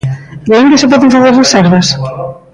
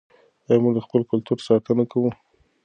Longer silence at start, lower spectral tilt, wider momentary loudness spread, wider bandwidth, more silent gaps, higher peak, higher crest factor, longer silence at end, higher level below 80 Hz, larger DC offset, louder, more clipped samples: second, 0.05 s vs 0.5 s; second, -5 dB/octave vs -8.5 dB/octave; first, 13 LU vs 5 LU; first, 11 kHz vs 9.2 kHz; neither; first, 0 dBFS vs -4 dBFS; second, 8 dB vs 18 dB; second, 0.2 s vs 0.5 s; first, -42 dBFS vs -64 dBFS; neither; first, -7 LUFS vs -22 LUFS; neither